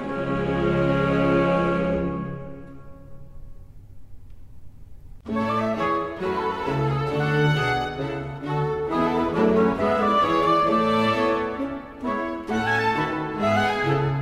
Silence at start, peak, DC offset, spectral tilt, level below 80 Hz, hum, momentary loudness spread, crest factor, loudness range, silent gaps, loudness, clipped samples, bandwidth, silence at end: 0 s; -8 dBFS; under 0.1%; -7 dB/octave; -44 dBFS; none; 10 LU; 16 dB; 10 LU; none; -23 LUFS; under 0.1%; 13 kHz; 0 s